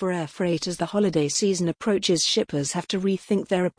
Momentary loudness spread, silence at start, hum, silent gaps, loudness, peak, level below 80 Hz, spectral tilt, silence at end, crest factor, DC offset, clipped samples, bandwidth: 5 LU; 0 s; none; none; -24 LUFS; -10 dBFS; -60 dBFS; -4.5 dB/octave; 0.1 s; 14 dB; under 0.1%; under 0.1%; 10.5 kHz